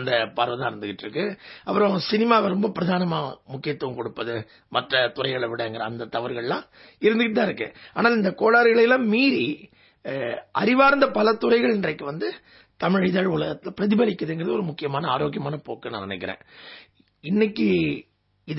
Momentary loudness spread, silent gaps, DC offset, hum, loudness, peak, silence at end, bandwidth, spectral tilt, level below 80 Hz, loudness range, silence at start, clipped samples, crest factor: 14 LU; none; under 0.1%; none; -23 LUFS; -4 dBFS; 0 s; 5.8 kHz; -9.5 dB/octave; -62 dBFS; 7 LU; 0 s; under 0.1%; 20 dB